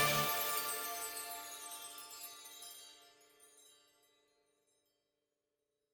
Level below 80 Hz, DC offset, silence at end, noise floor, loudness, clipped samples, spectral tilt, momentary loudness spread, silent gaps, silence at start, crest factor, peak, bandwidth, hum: -76 dBFS; under 0.1%; 2.2 s; -88 dBFS; -39 LUFS; under 0.1%; -1.5 dB/octave; 18 LU; none; 0 s; 24 dB; -20 dBFS; 19.5 kHz; none